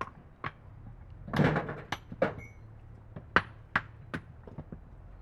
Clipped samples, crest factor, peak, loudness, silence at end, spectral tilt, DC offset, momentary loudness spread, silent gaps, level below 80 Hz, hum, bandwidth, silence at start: under 0.1%; 32 dB; -4 dBFS; -33 LUFS; 0 s; -6.5 dB/octave; under 0.1%; 22 LU; none; -52 dBFS; none; 13.5 kHz; 0 s